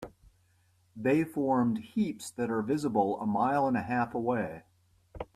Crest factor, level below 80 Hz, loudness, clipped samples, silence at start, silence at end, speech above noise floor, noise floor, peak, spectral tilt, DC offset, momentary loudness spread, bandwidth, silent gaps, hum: 18 dB; -62 dBFS; -30 LUFS; under 0.1%; 0 s; 0.1 s; 38 dB; -68 dBFS; -12 dBFS; -7 dB/octave; under 0.1%; 8 LU; 14 kHz; none; none